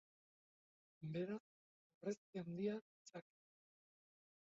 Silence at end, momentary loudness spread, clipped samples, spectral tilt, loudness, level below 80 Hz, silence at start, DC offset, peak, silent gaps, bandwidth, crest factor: 1.3 s; 13 LU; under 0.1%; -7.5 dB/octave; -49 LUFS; under -90 dBFS; 1 s; under 0.1%; -32 dBFS; 1.40-2.01 s, 2.17-2.33 s, 2.81-3.05 s; 7.4 kHz; 20 dB